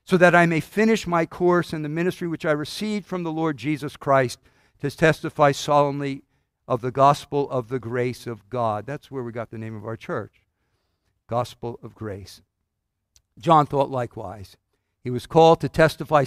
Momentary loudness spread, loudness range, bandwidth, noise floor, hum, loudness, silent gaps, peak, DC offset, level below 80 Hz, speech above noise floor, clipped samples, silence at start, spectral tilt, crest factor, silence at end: 17 LU; 11 LU; 15.5 kHz; -78 dBFS; none; -22 LUFS; none; -2 dBFS; under 0.1%; -54 dBFS; 56 dB; under 0.1%; 0.1 s; -6 dB/octave; 20 dB; 0 s